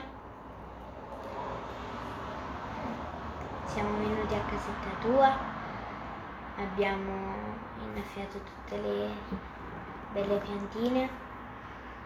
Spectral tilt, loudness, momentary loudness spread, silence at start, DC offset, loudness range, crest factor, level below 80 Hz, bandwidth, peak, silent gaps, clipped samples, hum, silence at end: -6.5 dB/octave; -35 LUFS; 14 LU; 0 s; under 0.1%; 7 LU; 22 dB; -50 dBFS; 15 kHz; -12 dBFS; none; under 0.1%; none; 0 s